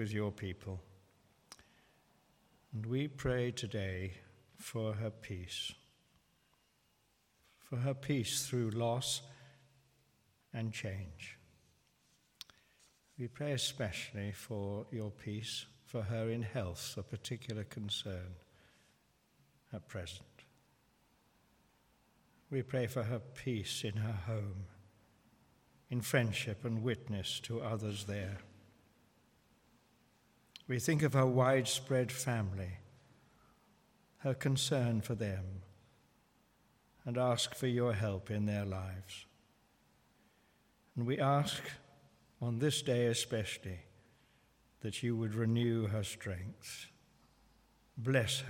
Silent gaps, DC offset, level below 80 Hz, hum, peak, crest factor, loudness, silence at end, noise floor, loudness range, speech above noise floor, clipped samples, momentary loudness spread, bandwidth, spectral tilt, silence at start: none; under 0.1%; -70 dBFS; none; -16 dBFS; 22 dB; -38 LUFS; 0 s; -75 dBFS; 10 LU; 38 dB; under 0.1%; 16 LU; 17 kHz; -5 dB/octave; 0 s